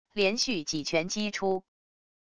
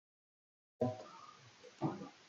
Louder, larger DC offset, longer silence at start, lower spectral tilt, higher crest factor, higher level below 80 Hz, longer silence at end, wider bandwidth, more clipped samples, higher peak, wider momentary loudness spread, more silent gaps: first, -29 LUFS vs -43 LUFS; first, 0.4% vs under 0.1%; second, 0.05 s vs 0.8 s; second, -3 dB/octave vs -7.5 dB/octave; about the same, 18 dB vs 22 dB; first, -62 dBFS vs -84 dBFS; first, 0.65 s vs 0 s; first, 11 kHz vs 7.6 kHz; neither; first, -12 dBFS vs -22 dBFS; second, 5 LU vs 18 LU; neither